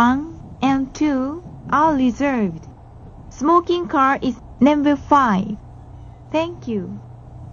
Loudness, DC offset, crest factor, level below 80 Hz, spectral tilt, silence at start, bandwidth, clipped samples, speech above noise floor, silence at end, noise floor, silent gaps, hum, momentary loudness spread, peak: -19 LUFS; under 0.1%; 18 dB; -44 dBFS; -6.5 dB/octave; 0 s; 7.2 kHz; under 0.1%; 22 dB; 0 s; -40 dBFS; none; none; 18 LU; 0 dBFS